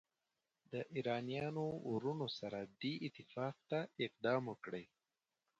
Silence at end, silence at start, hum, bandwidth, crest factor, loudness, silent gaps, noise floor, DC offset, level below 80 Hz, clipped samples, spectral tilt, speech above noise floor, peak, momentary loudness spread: 0.75 s; 0.7 s; none; 8 kHz; 20 dB; -43 LUFS; none; under -90 dBFS; under 0.1%; -80 dBFS; under 0.1%; -7 dB/octave; over 47 dB; -24 dBFS; 9 LU